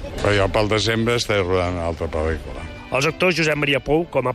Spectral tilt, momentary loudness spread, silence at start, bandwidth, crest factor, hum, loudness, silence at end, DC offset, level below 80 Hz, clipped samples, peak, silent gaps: -5 dB/octave; 7 LU; 0 s; 14 kHz; 14 dB; none; -20 LUFS; 0 s; under 0.1%; -36 dBFS; under 0.1%; -6 dBFS; none